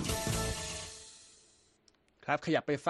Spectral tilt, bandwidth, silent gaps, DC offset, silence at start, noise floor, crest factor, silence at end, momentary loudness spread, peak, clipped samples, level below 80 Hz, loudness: -4 dB/octave; 13 kHz; none; under 0.1%; 0 s; -69 dBFS; 22 dB; 0 s; 18 LU; -16 dBFS; under 0.1%; -50 dBFS; -35 LUFS